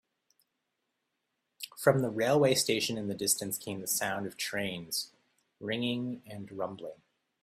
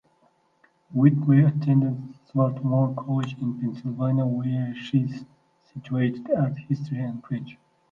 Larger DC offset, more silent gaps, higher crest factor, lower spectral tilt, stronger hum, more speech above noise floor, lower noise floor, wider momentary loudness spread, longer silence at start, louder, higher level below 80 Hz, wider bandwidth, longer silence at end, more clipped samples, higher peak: neither; neither; about the same, 24 dB vs 20 dB; second, -3.5 dB/octave vs -10 dB/octave; neither; first, 51 dB vs 41 dB; first, -83 dBFS vs -64 dBFS; first, 18 LU vs 13 LU; first, 1.6 s vs 0.9 s; second, -31 LUFS vs -25 LUFS; second, -72 dBFS vs -66 dBFS; first, 16 kHz vs 5.8 kHz; about the same, 0.5 s vs 0.4 s; neither; second, -10 dBFS vs -6 dBFS